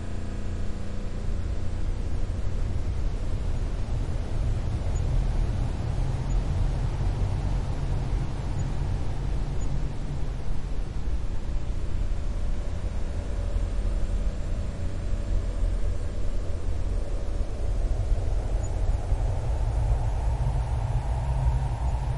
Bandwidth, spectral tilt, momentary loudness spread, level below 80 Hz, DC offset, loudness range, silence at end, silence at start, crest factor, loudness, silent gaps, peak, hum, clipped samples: 11 kHz; -7 dB/octave; 5 LU; -28 dBFS; under 0.1%; 4 LU; 0 s; 0 s; 14 dB; -31 LUFS; none; -12 dBFS; none; under 0.1%